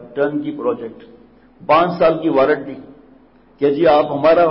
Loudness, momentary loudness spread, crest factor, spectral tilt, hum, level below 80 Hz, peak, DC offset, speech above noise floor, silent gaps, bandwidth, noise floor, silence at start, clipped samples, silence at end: -16 LUFS; 18 LU; 14 dB; -11 dB/octave; none; -54 dBFS; -2 dBFS; under 0.1%; 33 dB; none; 5.8 kHz; -48 dBFS; 0 s; under 0.1%; 0 s